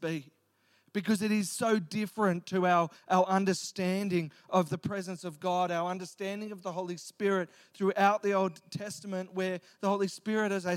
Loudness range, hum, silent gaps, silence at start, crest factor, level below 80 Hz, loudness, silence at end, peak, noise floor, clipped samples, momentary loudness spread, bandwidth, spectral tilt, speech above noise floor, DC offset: 4 LU; none; none; 0 s; 20 dB; -78 dBFS; -31 LUFS; 0 s; -12 dBFS; -70 dBFS; under 0.1%; 11 LU; 16 kHz; -5.5 dB/octave; 39 dB; under 0.1%